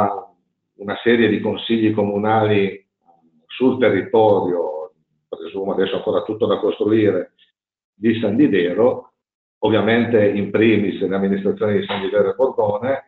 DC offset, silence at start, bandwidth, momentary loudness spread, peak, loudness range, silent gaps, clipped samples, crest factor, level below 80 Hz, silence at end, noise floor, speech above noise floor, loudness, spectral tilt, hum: under 0.1%; 0 s; 4.4 kHz; 11 LU; -2 dBFS; 3 LU; 7.84-7.93 s, 9.35-9.61 s; under 0.1%; 16 dB; -60 dBFS; 0.05 s; -61 dBFS; 44 dB; -18 LUFS; -5 dB/octave; none